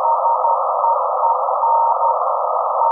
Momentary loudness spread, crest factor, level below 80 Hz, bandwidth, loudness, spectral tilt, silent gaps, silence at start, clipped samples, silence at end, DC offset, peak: 3 LU; 12 dB; under -90 dBFS; 1.5 kHz; -17 LUFS; -5 dB/octave; none; 0 s; under 0.1%; 0 s; under 0.1%; -4 dBFS